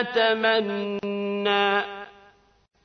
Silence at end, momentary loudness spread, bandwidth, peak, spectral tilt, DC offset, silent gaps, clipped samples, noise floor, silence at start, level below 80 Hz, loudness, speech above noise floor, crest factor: 0.75 s; 14 LU; 6.4 kHz; -8 dBFS; -5.5 dB/octave; under 0.1%; none; under 0.1%; -57 dBFS; 0 s; -70 dBFS; -24 LUFS; 34 dB; 18 dB